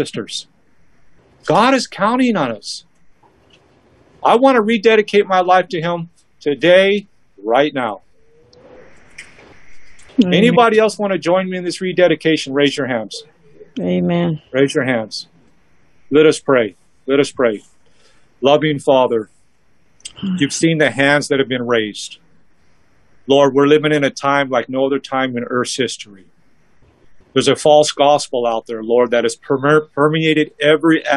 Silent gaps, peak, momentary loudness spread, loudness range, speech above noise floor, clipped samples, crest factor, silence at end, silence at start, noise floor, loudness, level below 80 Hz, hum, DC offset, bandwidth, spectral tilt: none; 0 dBFS; 15 LU; 4 LU; 45 dB; under 0.1%; 16 dB; 0 s; 0 s; -60 dBFS; -15 LUFS; -60 dBFS; none; 0.3%; 12 kHz; -5 dB/octave